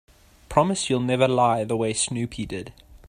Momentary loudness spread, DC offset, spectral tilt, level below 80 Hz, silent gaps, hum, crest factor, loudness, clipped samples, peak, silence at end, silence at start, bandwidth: 13 LU; under 0.1%; -4.5 dB/octave; -50 dBFS; none; none; 22 dB; -23 LUFS; under 0.1%; -2 dBFS; 0.1 s; 0.5 s; 14.5 kHz